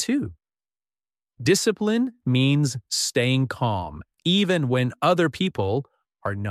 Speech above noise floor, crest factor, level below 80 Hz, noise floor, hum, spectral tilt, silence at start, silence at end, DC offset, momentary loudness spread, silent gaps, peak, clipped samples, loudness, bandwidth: over 68 dB; 16 dB; -56 dBFS; under -90 dBFS; none; -5 dB/octave; 0 s; 0 s; under 0.1%; 9 LU; none; -8 dBFS; under 0.1%; -23 LUFS; 15 kHz